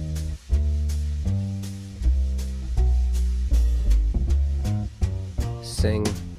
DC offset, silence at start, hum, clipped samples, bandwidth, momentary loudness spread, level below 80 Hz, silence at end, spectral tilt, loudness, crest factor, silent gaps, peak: under 0.1%; 0 s; none; under 0.1%; 13.5 kHz; 7 LU; -24 dBFS; 0 s; -6.5 dB/octave; -26 LUFS; 14 dB; none; -10 dBFS